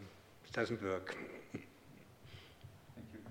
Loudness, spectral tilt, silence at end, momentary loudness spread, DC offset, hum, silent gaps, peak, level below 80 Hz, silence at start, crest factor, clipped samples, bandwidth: -43 LUFS; -5.5 dB/octave; 0 s; 21 LU; under 0.1%; none; none; -22 dBFS; -72 dBFS; 0 s; 24 dB; under 0.1%; 17.5 kHz